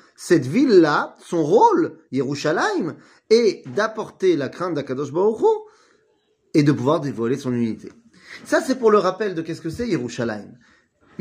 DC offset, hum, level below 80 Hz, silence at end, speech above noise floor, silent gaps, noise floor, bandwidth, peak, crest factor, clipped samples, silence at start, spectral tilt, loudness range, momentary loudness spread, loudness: under 0.1%; none; -60 dBFS; 0.7 s; 44 dB; none; -64 dBFS; 15.5 kHz; -2 dBFS; 18 dB; under 0.1%; 0.2 s; -6 dB/octave; 4 LU; 12 LU; -20 LUFS